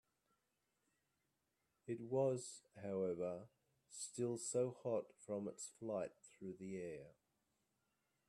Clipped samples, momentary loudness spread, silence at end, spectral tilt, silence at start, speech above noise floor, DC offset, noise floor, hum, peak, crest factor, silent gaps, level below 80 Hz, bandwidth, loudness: under 0.1%; 13 LU; 1.2 s; -5.5 dB/octave; 1.85 s; 42 dB; under 0.1%; -87 dBFS; none; -28 dBFS; 18 dB; none; -86 dBFS; 12.5 kHz; -45 LUFS